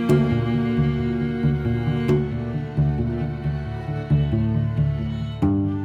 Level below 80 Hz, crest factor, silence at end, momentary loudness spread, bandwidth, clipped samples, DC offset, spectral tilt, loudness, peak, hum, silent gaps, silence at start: -34 dBFS; 16 dB; 0 s; 6 LU; 7.8 kHz; under 0.1%; under 0.1%; -9 dB/octave; -23 LUFS; -6 dBFS; none; none; 0 s